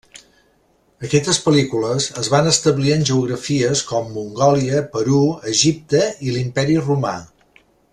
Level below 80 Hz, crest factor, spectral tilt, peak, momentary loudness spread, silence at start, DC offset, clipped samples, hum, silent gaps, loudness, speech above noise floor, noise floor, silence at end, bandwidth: -50 dBFS; 18 dB; -4.5 dB/octave; 0 dBFS; 7 LU; 0.15 s; under 0.1%; under 0.1%; none; none; -18 LUFS; 42 dB; -59 dBFS; 0.65 s; 12 kHz